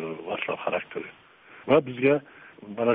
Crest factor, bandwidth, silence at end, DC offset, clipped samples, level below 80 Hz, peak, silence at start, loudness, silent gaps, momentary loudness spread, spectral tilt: 20 dB; 4 kHz; 0 s; under 0.1%; under 0.1%; -66 dBFS; -8 dBFS; 0 s; -26 LUFS; none; 19 LU; -4.5 dB/octave